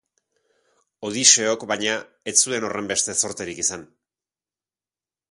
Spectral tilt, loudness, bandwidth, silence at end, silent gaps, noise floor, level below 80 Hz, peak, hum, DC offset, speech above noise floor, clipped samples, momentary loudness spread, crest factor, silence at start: -0.5 dB/octave; -20 LUFS; 13 kHz; 1.5 s; none; under -90 dBFS; -64 dBFS; 0 dBFS; none; under 0.1%; over 68 dB; under 0.1%; 14 LU; 24 dB; 1 s